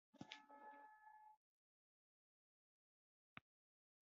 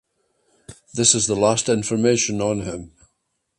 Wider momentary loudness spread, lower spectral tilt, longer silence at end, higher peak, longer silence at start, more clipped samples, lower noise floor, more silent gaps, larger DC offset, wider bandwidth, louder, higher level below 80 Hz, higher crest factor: second, 7 LU vs 15 LU; second, -2 dB/octave vs -3.5 dB/octave; about the same, 0.7 s vs 0.7 s; second, -34 dBFS vs 0 dBFS; second, 0.15 s vs 0.7 s; neither; first, under -90 dBFS vs -73 dBFS; first, 1.37-3.36 s vs none; neither; second, 6.8 kHz vs 11.5 kHz; second, -63 LUFS vs -19 LUFS; second, under -90 dBFS vs -52 dBFS; first, 34 dB vs 22 dB